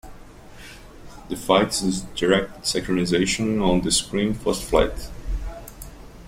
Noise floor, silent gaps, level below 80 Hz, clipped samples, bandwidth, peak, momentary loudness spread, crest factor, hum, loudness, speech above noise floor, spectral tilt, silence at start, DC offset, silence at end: -42 dBFS; none; -36 dBFS; under 0.1%; 16 kHz; -2 dBFS; 22 LU; 22 dB; none; -22 LUFS; 21 dB; -4 dB/octave; 0.05 s; under 0.1%; 0 s